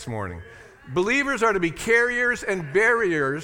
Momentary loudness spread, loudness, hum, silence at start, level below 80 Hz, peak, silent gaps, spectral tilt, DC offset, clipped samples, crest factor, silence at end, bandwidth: 12 LU; -22 LUFS; none; 0 s; -50 dBFS; -6 dBFS; none; -4.5 dB/octave; under 0.1%; under 0.1%; 16 dB; 0 s; 17.5 kHz